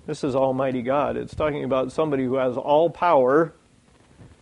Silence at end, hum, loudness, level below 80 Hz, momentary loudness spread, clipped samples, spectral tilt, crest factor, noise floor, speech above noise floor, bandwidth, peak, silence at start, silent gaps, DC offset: 0.15 s; none; -22 LUFS; -52 dBFS; 7 LU; under 0.1%; -7 dB/octave; 16 dB; -56 dBFS; 35 dB; 10.5 kHz; -6 dBFS; 0.05 s; none; under 0.1%